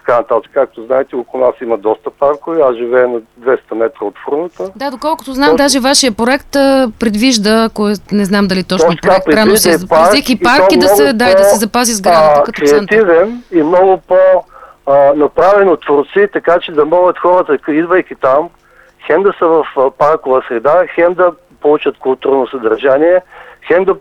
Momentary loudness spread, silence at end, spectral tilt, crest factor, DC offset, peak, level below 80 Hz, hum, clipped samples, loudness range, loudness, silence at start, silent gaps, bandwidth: 8 LU; 0 s; -4 dB/octave; 10 dB; under 0.1%; 0 dBFS; -42 dBFS; none; under 0.1%; 5 LU; -10 LUFS; 0.05 s; none; 16 kHz